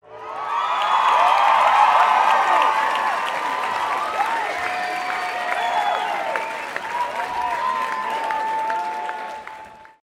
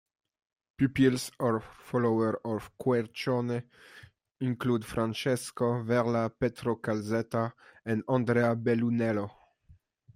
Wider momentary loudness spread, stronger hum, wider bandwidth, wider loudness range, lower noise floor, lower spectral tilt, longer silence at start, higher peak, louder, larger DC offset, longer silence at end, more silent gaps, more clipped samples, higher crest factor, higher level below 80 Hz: first, 12 LU vs 8 LU; neither; about the same, 16 kHz vs 16 kHz; first, 7 LU vs 2 LU; second, -41 dBFS vs -62 dBFS; second, -1.5 dB/octave vs -6.5 dB/octave; second, 0.05 s vs 0.8 s; first, -4 dBFS vs -14 dBFS; first, -20 LUFS vs -30 LUFS; neither; second, 0.2 s vs 0.85 s; neither; neither; about the same, 16 dB vs 18 dB; about the same, -64 dBFS vs -62 dBFS